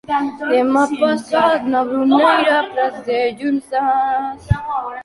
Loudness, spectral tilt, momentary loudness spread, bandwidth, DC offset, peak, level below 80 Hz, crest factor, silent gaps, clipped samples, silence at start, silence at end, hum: -17 LUFS; -6.5 dB/octave; 8 LU; 11.5 kHz; under 0.1%; -2 dBFS; -38 dBFS; 16 dB; none; under 0.1%; 0.1 s; 0 s; none